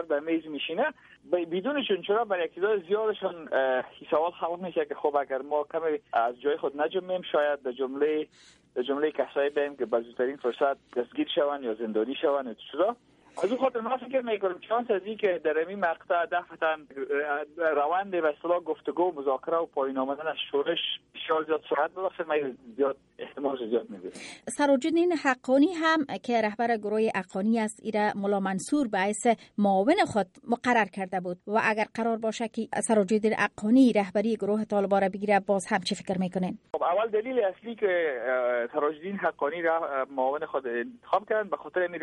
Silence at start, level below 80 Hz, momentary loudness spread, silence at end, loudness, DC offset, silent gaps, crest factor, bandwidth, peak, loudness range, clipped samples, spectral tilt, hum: 0 s; -72 dBFS; 7 LU; 0 s; -28 LUFS; under 0.1%; none; 18 dB; 11.5 kHz; -10 dBFS; 4 LU; under 0.1%; -5 dB/octave; none